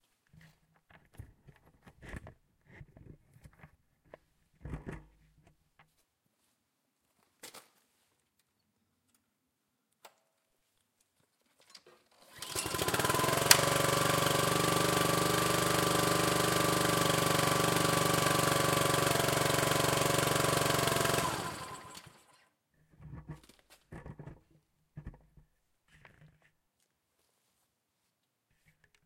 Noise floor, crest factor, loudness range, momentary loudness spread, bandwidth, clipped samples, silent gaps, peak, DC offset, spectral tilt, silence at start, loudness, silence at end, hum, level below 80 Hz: -81 dBFS; 32 dB; 24 LU; 23 LU; 17 kHz; under 0.1%; none; -2 dBFS; under 0.1%; -3 dB/octave; 1.2 s; -29 LUFS; 3.95 s; none; -58 dBFS